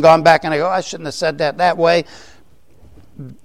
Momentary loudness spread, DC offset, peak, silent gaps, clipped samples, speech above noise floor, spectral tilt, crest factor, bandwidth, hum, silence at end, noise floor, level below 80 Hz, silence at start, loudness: 21 LU; 0.7%; 0 dBFS; none; under 0.1%; 36 dB; -4.5 dB/octave; 16 dB; 13 kHz; none; 0.1 s; -51 dBFS; -52 dBFS; 0 s; -15 LUFS